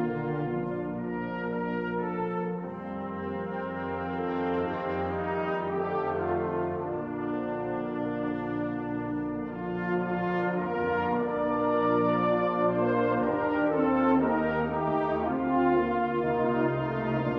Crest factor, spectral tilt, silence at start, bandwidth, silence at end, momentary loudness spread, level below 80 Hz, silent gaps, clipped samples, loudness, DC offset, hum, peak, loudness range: 14 dB; -9.5 dB/octave; 0 s; 5.6 kHz; 0 s; 8 LU; -56 dBFS; none; under 0.1%; -29 LUFS; under 0.1%; none; -14 dBFS; 6 LU